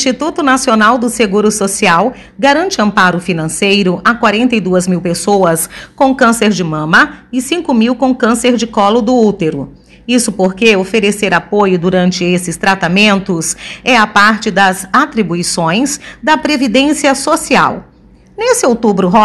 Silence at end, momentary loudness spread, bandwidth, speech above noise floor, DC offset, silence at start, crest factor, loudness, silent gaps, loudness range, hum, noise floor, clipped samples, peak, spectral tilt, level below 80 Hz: 0 s; 7 LU; 12.5 kHz; 26 dB; under 0.1%; 0 s; 12 dB; -11 LUFS; none; 1 LU; none; -37 dBFS; 0.4%; 0 dBFS; -4 dB/octave; -44 dBFS